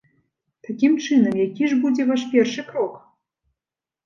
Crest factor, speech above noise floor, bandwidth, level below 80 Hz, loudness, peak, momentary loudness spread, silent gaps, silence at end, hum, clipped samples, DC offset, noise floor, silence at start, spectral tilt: 16 dB; 70 dB; 7.2 kHz; -72 dBFS; -20 LUFS; -4 dBFS; 9 LU; none; 1.05 s; none; under 0.1%; under 0.1%; -89 dBFS; 0.7 s; -5.5 dB/octave